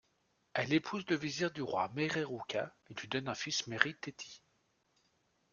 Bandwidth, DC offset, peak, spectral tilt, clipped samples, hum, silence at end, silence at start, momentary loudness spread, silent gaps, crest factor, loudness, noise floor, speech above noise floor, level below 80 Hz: 7.4 kHz; under 0.1%; -8 dBFS; -4 dB/octave; under 0.1%; none; 1.15 s; 0.55 s; 12 LU; none; 30 dB; -36 LUFS; -77 dBFS; 40 dB; -74 dBFS